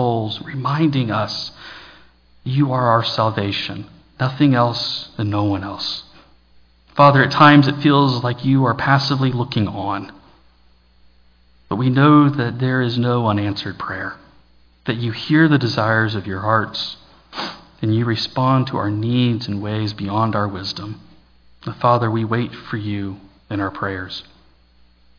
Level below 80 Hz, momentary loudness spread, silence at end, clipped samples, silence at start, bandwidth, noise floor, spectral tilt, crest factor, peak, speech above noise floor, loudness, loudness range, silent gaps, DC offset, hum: -54 dBFS; 16 LU; 0.95 s; under 0.1%; 0 s; 5.4 kHz; -53 dBFS; -7.5 dB/octave; 18 dB; 0 dBFS; 35 dB; -18 LUFS; 7 LU; none; under 0.1%; none